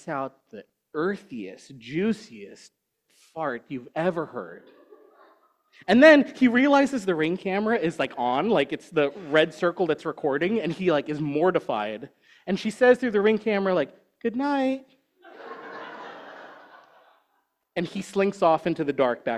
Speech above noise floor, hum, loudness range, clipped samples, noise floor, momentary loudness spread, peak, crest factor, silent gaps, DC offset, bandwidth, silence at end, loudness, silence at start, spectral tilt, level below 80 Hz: 49 dB; none; 12 LU; under 0.1%; -73 dBFS; 20 LU; -2 dBFS; 22 dB; none; under 0.1%; 12 kHz; 0 s; -24 LUFS; 0.05 s; -6 dB/octave; -68 dBFS